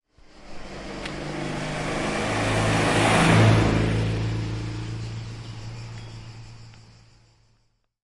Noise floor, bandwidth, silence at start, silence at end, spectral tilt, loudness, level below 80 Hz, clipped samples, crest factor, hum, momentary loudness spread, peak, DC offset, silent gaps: -67 dBFS; 11.5 kHz; 0.35 s; 1.25 s; -5.5 dB/octave; -23 LUFS; -40 dBFS; under 0.1%; 20 dB; none; 23 LU; -6 dBFS; under 0.1%; none